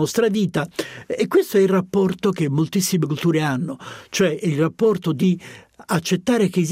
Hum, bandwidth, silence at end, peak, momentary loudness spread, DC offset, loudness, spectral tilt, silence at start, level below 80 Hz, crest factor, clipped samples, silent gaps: none; 16 kHz; 0 s; -6 dBFS; 10 LU; under 0.1%; -20 LUFS; -5.5 dB/octave; 0 s; -60 dBFS; 14 dB; under 0.1%; none